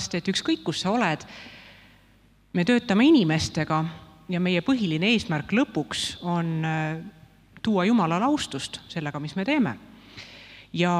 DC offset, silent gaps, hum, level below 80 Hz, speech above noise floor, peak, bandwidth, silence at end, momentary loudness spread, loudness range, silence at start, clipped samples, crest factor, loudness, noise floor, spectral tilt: under 0.1%; none; none; -58 dBFS; 34 dB; -8 dBFS; 13 kHz; 0 s; 20 LU; 3 LU; 0 s; under 0.1%; 18 dB; -25 LUFS; -58 dBFS; -5.5 dB/octave